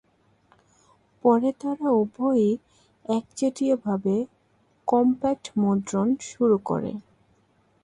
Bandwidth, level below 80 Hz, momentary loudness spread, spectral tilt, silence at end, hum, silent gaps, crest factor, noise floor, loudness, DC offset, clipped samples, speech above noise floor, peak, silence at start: 11 kHz; -64 dBFS; 8 LU; -7 dB/octave; 0.85 s; none; none; 18 dB; -64 dBFS; -24 LUFS; under 0.1%; under 0.1%; 41 dB; -6 dBFS; 1.25 s